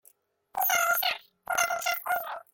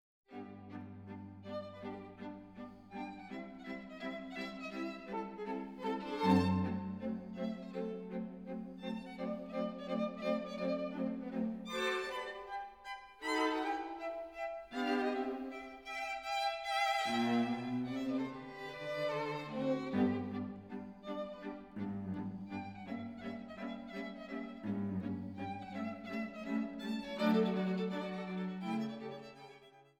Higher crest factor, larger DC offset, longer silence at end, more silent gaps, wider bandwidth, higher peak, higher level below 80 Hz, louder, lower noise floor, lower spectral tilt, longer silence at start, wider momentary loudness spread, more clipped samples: about the same, 18 dB vs 22 dB; neither; about the same, 0.1 s vs 0.15 s; neither; about the same, 17 kHz vs 16.5 kHz; first, -12 dBFS vs -16 dBFS; about the same, -72 dBFS vs -72 dBFS; first, -27 LUFS vs -39 LUFS; about the same, -63 dBFS vs -60 dBFS; second, 1.5 dB/octave vs -6 dB/octave; first, 0.55 s vs 0.3 s; second, 9 LU vs 14 LU; neither